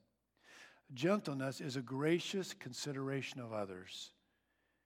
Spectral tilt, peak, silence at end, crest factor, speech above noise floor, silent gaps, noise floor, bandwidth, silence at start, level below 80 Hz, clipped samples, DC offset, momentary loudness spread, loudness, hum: -5 dB/octave; -22 dBFS; 0.75 s; 20 dB; 41 dB; none; -81 dBFS; 16 kHz; 0.5 s; -90 dBFS; under 0.1%; under 0.1%; 18 LU; -40 LUFS; none